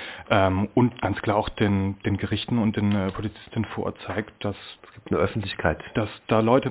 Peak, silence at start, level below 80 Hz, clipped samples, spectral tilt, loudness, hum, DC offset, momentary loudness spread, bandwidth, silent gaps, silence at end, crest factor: -4 dBFS; 0 s; -44 dBFS; under 0.1%; -11 dB/octave; -25 LUFS; none; under 0.1%; 10 LU; 4 kHz; none; 0 s; 20 dB